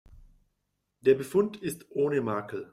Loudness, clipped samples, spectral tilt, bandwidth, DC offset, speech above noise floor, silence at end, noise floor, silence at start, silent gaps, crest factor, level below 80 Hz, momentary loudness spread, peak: -28 LUFS; under 0.1%; -6.5 dB/octave; 15 kHz; under 0.1%; 52 dB; 0.1 s; -80 dBFS; 1.05 s; none; 18 dB; -62 dBFS; 9 LU; -12 dBFS